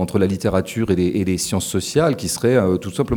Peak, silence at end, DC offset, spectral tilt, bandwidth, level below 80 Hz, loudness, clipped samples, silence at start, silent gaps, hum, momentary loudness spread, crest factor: -2 dBFS; 0 s; under 0.1%; -5.5 dB/octave; 19 kHz; -42 dBFS; -19 LUFS; under 0.1%; 0 s; none; none; 4 LU; 16 dB